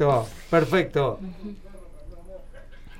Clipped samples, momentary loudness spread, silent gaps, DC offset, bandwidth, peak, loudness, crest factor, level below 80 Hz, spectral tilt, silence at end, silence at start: under 0.1%; 24 LU; none; under 0.1%; 16 kHz; -6 dBFS; -24 LUFS; 20 dB; -42 dBFS; -7 dB/octave; 0 s; 0 s